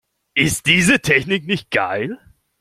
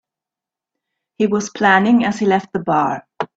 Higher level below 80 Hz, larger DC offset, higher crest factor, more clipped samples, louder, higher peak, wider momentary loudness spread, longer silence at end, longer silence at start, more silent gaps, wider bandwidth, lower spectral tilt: first, -46 dBFS vs -60 dBFS; neither; about the same, 18 dB vs 18 dB; neither; about the same, -17 LUFS vs -17 LUFS; about the same, 0 dBFS vs 0 dBFS; first, 11 LU vs 8 LU; first, 0.45 s vs 0.1 s; second, 0.35 s vs 1.2 s; neither; first, 16 kHz vs 8 kHz; second, -3.5 dB/octave vs -5.5 dB/octave